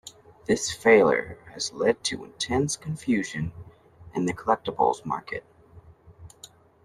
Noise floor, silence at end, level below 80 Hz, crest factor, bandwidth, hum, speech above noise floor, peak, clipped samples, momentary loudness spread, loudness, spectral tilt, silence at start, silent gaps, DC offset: -52 dBFS; 0.4 s; -56 dBFS; 22 dB; 13 kHz; none; 27 dB; -6 dBFS; under 0.1%; 18 LU; -25 LUFS; -4 dB/octave; 0.05 s; none; under 0.1%